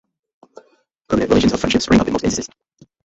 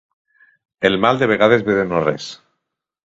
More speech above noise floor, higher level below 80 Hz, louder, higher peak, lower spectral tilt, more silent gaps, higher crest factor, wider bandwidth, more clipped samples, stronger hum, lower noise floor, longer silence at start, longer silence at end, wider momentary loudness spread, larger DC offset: second, 41 dB vs 61 dB; first, -38 dBFS vs -52 dBFS; about the same, -17 LUFS vs -16 LUFS; about the same, -2 dBFS vs 0 dBFS; about the same, -5 dB/octave vs -6 dB/octave; neither; about the same, 18 dB vs 18 dB; about the same, 8.2 kHz vs 7.8 kHz; neither; neither; second, -57 dBFS vs -77 dBFS; first, 1.1 s vs 0.8 s; second, 0.6 s vs 0.75 s; about the same, 9 LU vs 10 LU; neither